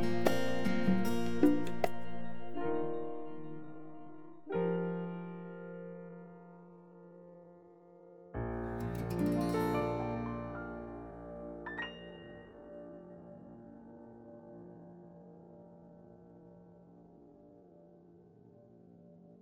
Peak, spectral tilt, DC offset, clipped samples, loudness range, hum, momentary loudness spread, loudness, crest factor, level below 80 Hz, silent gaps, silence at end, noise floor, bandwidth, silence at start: -12 dBFS; -7 dB/octave; under 0.1%; under 0.1%; 21 LU; none; 26 LU; -37 LUFS; 24 dB; -58 dBFS; none; 0 s; -60 dBFS; 17 kHz; 0 s